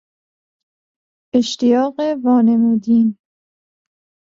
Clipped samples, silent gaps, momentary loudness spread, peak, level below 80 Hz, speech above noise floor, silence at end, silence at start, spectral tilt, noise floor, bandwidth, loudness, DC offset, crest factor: under 0.1%; none; 6 LU; -2 dBFS; -64 dBFS; over 76 dB; 1.2 s; 1.35 s; -6 dB/octave; under -90 dBFS; 7.6 kHz; -16 LUFS; under 0.1%; 16 dB